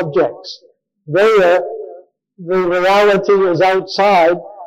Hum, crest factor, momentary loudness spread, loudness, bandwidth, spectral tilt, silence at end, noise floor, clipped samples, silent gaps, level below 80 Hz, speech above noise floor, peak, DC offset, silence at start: none; 10 dB; 19 LU; -13 LUFS; 15 kHz; -5.5 dB/octave; 0 s; -40 dBFS; under 0.1%; none; -54 dBFS; 27 dB; -4 dBFS; under 0.1%; 0 s